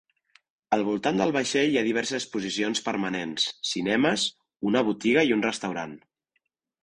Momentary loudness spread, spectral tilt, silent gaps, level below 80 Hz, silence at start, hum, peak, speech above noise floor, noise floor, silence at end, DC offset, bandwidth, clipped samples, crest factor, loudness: 7 LU; -3.5 dB/octave; none; -66 dBFS; 0.7 s; none; -8 dBFS; 51 dB; -77 dBFS; 0.85 s; under 0.1%; 10.5 kHz; under 0.1%; 20 dB; -26 LUFS